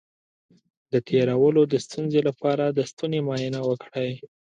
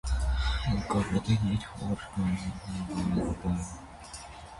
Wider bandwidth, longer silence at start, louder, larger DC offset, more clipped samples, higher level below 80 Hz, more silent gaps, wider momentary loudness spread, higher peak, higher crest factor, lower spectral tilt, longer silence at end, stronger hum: second, 10 kHz vs 11.5 kHz; first, 0.9 s vs 0.05 s; first, -24 LUFS vs -31 LUFS; neither; neither; second, -68 dBFS vs -36 dBFS; first, 2.93-2.97 s vs none; second, 9 LU vs 15 LU; first, -8 dBFS vs -14 dBFS; about the same, 16 dB vs 16 dB; about the same, -7 dB/octave vs -6 dB/octave; first, 0.25 s vs 0 s; neither